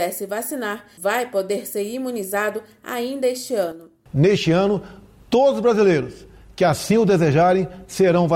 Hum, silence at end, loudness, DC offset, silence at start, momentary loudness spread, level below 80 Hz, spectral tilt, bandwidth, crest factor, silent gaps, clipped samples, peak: none; 0 s; -20 LUFS; under 0.1%; 0 s; 11 LU; -52 dBFS; -6 dB/octave; 17 kHz; 12 dB; none; under 0.1%; -8 dBFS